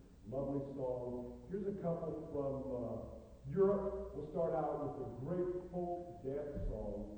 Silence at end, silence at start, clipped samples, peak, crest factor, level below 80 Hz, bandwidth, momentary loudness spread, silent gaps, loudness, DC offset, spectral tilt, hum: 0 s; 0 s; under 0.1%; -22 dBFS; 18 dB; -54 dBFS; 9 kHz; 9 LU; none; -41 LUFS; under 0.1%; -10 dB/octave; none